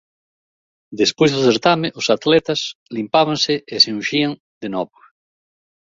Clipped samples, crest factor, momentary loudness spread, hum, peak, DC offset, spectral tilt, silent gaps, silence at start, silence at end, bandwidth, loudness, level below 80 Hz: under 0.1%; 18 dB; 12 LU; none; 0 dBFS; under 0.1%; -4 dB/octave; 2.75-2.86 s, 4.40-4.61 s; 0.9 s; 1.05 s; 7.8 kHz; -17 LUFS; -60 dBFS